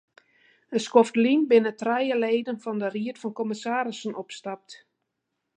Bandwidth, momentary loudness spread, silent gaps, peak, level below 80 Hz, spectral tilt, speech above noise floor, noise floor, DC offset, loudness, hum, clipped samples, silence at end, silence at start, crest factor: 9.8 kHz; 15 LU; none; -4 dBFS; -82 dBFS; -5 dB/octave; 56 dB; -81 dBFS; under 0.1%; -25 LUFS; none; under 0.1%; 0.8 s; 0.7 s; 22 dB